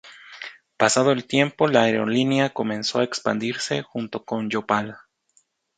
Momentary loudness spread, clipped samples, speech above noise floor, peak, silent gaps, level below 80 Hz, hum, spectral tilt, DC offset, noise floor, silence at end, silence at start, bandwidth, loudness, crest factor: 17 LU; under 0.1%; 43 dB; 0 dBFS; none; -66 dBFS; none; -4.5 dB/octave; under 0.1%; -65 dBFS; 0.8 s; 0.05 s; 9.6 kHz; -22 LUFS; 22 dB